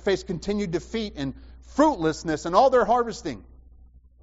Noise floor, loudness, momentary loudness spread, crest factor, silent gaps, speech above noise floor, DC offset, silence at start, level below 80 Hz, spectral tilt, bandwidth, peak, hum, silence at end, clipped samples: -51 dBFS; -24 LUFS; 15 LU; 18 dB; none; 27 dB; under 0.1%; 0 s; -46 dBFS; -4.5 dB/octave; 8 kHz; -6 dBFS; none; 0.8 s; under 0.1%